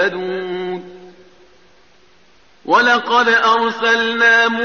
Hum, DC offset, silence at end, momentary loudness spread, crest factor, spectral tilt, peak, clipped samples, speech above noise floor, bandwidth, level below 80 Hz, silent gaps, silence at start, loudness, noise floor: none; 0.3%; 0 s; 14 LU; 14 dB; 0 dB/octave; -4 dBFS; under 0.1%; 39 dB; 7 kHz; -62 dBFS; none; 0 s; -14 LUFS; -53 dBFS